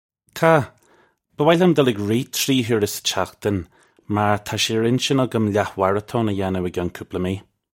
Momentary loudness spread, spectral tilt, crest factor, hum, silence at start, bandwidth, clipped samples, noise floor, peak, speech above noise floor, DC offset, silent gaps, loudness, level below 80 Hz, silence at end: 10 LU; -5 dB/octave; 20 dB; none; 0.35 s; 16.5 kHz; under 0.1%; -58 dBFS; 0 dBFS; 38 dB; under 0.1%; none; -20 LUFS; -54 dBFS; 0.4 s